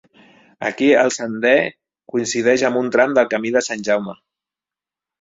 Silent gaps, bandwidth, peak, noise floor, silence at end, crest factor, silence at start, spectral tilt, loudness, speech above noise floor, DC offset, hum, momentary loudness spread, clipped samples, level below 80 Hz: none; 8 kHz; -2 dBFS; -89 dBFS; 1.1 s; 18 dB; 0.6 s; -3.5 dB/octave; -18 LUFS; 72 dB; under 0.1%; none; 11 LU; under 0.1%; -62 dBFS